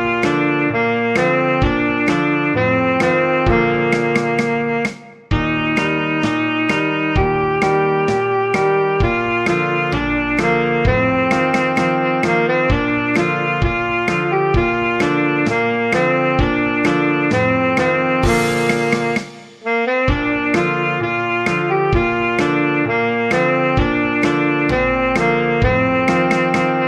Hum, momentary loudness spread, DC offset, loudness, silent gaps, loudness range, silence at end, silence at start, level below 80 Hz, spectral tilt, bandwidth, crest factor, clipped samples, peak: none; 2 LU; under 0.1%; -16 LUFS; none; 2 LU; 0 s; 0 s; -32 dBFS; -6.5 dB/octave; 13.5 kHz; 14 dB; under 0.1%; -2 dBFS